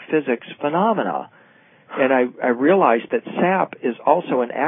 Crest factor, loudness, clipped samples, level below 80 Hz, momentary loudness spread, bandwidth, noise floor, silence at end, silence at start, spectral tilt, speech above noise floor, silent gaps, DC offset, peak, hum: 18 dB; -20 LUFS; under 0.1%; -78 dBFS; 9 LU; 3.9 kHz; -52 dBFS; 0 s; 0 s; -11 dB/octave; 33 dB; none; under 0.1%; -2 dBFS; none